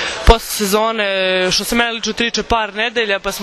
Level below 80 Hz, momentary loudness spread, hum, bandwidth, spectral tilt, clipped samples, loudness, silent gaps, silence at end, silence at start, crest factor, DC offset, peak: -24 dBFS; 4 LU; none; 14 kHz; -3 dB/octave; 0.3%; -15 LUFS; none; 0 s; 0 s; 16 dB; under 0.1%; 0 dBFS